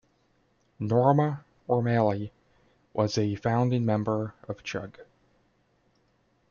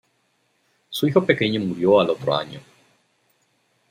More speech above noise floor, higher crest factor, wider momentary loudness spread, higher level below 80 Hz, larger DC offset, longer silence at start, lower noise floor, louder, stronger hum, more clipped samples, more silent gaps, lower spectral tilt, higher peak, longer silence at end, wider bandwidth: second, 42 dB vs 48 dB; about the same, 20 dB vs 22 dB; about the same, 14 LU vs 15 LU; about the same, -64 dBFS vs -64 dBFS; neither; about the same, 0.8 s vs 0.9 s; about the same, -68 dBFS vs -67 dBFS; second, -27 LUFS vs -20 LUFS; neither; neither; neither; first, -7.5 dB/octave vs -6 dB/octave; second, -8 dBFS vs -2 dBFS; first, 1.45 s vs 1.3 s; second, 7 kHz vs 16 kHz